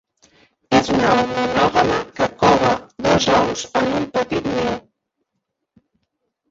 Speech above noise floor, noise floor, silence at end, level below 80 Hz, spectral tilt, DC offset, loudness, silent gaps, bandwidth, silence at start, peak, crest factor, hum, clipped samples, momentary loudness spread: 58 dB; -77 dBFS; 1.7 s; -46 dBFS; -4.5 dB/octave; under 0.1%; -18 LUFS; none; 8 kHz; 0.7 s; -2 dBFS; 18 dB; none; under 0.1%; 7 LU